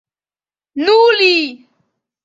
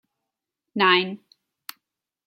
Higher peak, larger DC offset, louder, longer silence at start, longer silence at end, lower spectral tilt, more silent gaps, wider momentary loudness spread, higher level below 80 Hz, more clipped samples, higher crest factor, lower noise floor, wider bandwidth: about the same, -2 dBFS vs -4 dBFS; neither; first, -11 LUFS vs -20 LUFS; about the same, 0.75 s vs 0.75 s; second, 0.7 s vs 1.1 s; second, -2 dB/octave vs -4.5 dB/octave; neither; second, 15 LU vs 23 LU; first, -68 dBFS vs -78 dBFS; neither; second, 14 dB vs 24 dB; first, under -90 dBFS vs -84 dBFS; second, 7.8 kHz vs 16 kHz